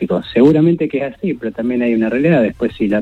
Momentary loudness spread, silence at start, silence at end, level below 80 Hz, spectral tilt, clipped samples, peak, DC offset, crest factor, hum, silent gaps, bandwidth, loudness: 10 LU; 0 s; 0 s; -46 dBFS; -9 dB/octave; under 0.1%; 0 dBFS; under 0.1%; 14 dB; none; none; 8 kHz; -15 LUFS